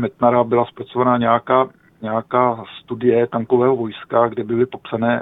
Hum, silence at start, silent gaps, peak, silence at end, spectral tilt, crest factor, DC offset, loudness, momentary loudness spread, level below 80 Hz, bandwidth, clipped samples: none; 0 s; none; 0 dBFS; 0 s; -10 dB/octave; 18 dB; under 0.1%; -18 LUFS; 9 LU; -58 dBFS; 4 kHz; under 0.1%